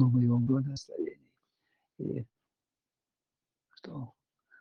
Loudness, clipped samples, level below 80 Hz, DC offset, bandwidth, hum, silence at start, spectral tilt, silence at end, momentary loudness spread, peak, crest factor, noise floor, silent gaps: -32 LUFS; under 0.1%; -70 dBFS; under 0.1%; 6.8 kHz; none; 0 s; -9 dB/octave; 0.5 s; 21 LU; -14 dBFS; 20 dB; under -90 dBFS; none